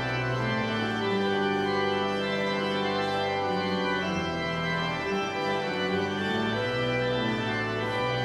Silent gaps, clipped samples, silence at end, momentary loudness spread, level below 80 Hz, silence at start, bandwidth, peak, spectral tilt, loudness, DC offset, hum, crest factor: none; under 0.1%; 0 s; 2 LU; -56 dBFS; 0 s; 12.5 kHz; -16 dBFS; -5.5 dB/octave; -28 LUFS; under 0.1%; none; 12 dB